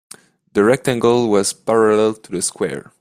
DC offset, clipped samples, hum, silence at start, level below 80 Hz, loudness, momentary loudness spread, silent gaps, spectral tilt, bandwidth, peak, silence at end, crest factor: under 0.1%; under 0.1%; none; 0.55 s; -56 dBFS; -17 LUFS; 8 LU; none; -4.5 dB/octave; 15.5 kHz; -2 dBFS; 0.2 s; 16 dB